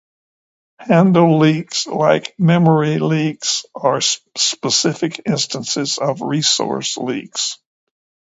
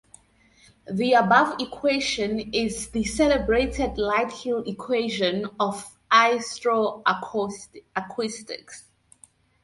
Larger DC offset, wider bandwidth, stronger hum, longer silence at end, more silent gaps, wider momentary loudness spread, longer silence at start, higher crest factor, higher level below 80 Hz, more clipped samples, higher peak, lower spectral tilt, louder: neither; second, 8 kHz vs 11.5 kHz; neither; about the same, 0.7 s vs 0.8 s; neither; second, 9 LU vs 14 LU; about the same, 0.8 s vs 0.9 s; second, 16 dB vs 22 dB; second, -62 dBFS vs -46 dBFS; neither; first, 0 dBFS vs -4 dBFS; about the same, -4.5 dB/octave vs -4 dB/octave; first, -16 LUFS vs -24 LUFS